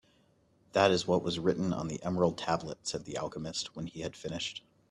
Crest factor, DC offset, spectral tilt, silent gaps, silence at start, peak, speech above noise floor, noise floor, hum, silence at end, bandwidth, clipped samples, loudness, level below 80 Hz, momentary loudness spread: 24 dB; under 0.1%; -5 dB/octave; none; 0.75 s; -10 dBFS; 36 dB; -68 dBFS; none; 0.3 s; 11.5 kHz; under 0.1%; -33 LUFS; -62 dBFS; 13 LU